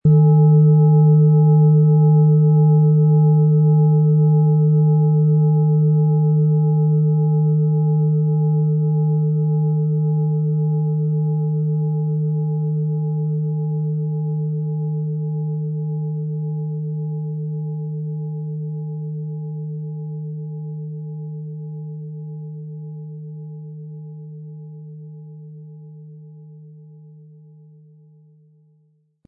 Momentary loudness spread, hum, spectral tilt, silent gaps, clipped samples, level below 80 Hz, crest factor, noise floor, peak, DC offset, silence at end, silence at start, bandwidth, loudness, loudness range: 20 LU; none; -18 dB/octave; none; under 0.1%; -64 dBFS; 12 dB; -61 dBFS; -6 dBFS; under 0.1%; 2.45 s; 0.05 s; 1.4 kHz; -18 LUFS; 20 LU